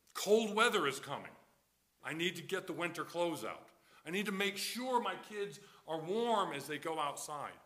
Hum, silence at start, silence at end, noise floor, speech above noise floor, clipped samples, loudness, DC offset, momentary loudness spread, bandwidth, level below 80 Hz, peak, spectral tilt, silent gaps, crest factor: none; 0.15 s; 0.05 s; -75 dBFS; 38 dB; under 0.1%; -37 LUFS; under 0.1%; 14 LU; 15.5 kHz; -84 dBFS; -16 dBFS; -3.5 dB/octave; none; 22 dB